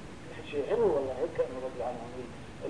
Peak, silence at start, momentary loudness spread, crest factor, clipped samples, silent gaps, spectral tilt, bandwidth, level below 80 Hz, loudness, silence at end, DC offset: -16 dBFS; 0 s; 16 LU; 18 dB; under 0.1%; none; -6.5 dB/octave; 10.5 kHz; -56 dBFS; -33 LUFS; 0 s; 0.3%